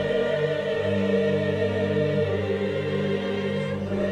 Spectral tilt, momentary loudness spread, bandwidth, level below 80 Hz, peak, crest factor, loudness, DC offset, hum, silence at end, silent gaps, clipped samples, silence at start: -7.5 dB/octave; 4 LU; 10 kHz; -56 dBFS; -12 dBFS; 12 dB; -25 LUFS; under 0.1%; 50 Hz at -40 dBFS; 0 s; none; under 0.1%; 0 s